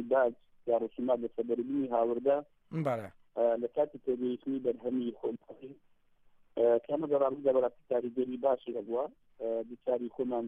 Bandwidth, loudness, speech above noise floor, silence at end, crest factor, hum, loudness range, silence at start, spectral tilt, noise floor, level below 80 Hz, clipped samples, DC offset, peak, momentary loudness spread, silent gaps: 4.1 kHz; -33 LUFS; 32 dB; 0 s; 16 dB; none; 3 LU; 0 s; -9 dB/octave; -64 dBFS; -74 dBFS; under 0.1%; under 0.1%; -16 dBFS; 11 LU; none